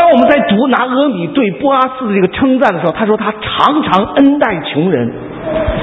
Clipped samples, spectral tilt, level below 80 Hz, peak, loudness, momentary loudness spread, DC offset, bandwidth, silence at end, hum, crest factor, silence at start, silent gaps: 0.2%; -8 dB/octave; -34 dBFS; 0 dBFS; -12 LUFS; 7 LU; under 0.1%; 6.2 kHz; 0 s; none; 12 dB; 0 s; none